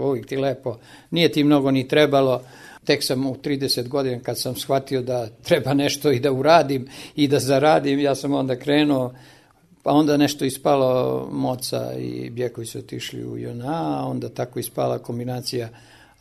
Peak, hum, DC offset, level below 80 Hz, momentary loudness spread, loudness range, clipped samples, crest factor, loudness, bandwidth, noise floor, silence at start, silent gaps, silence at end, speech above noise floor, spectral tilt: 0 dBFS; none; under 0.1%; -58 dBFS; 13 LU; 8 LU; under 0.1%; 20 dB; -21 LUFS; 13.5 kHz; -54 dBFS; 0 s; none; 0.45 s; 33 dB; -5.5 dB/octave